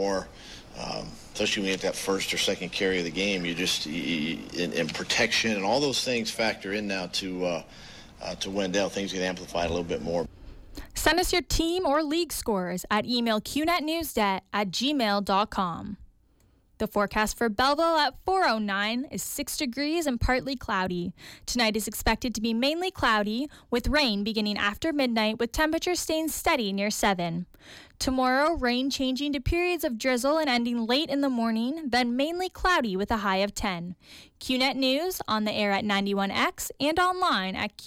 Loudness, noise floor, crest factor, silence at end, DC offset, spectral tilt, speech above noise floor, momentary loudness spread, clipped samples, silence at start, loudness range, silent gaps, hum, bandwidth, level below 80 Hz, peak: -27 LUFS; -62 dBFS; 14 dB; 0 s; under 0.1%; -3.5 dB/octave; 35 dB; 8 LU; under 0.1%; 0 s; 3 LU; none; none; 17 kHz; -46 dBFS; -12 dBFS